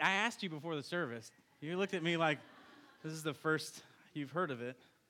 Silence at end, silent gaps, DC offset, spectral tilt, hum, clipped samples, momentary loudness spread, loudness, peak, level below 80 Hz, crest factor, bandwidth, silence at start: 0.35 s; none; under 0.1%; -4.5 dB/octave; none; under 0.1%; 16 LU; -38 LUFS; -16 dBFS; under -90 dBFS; 22 dB; 17 kHz; 0 s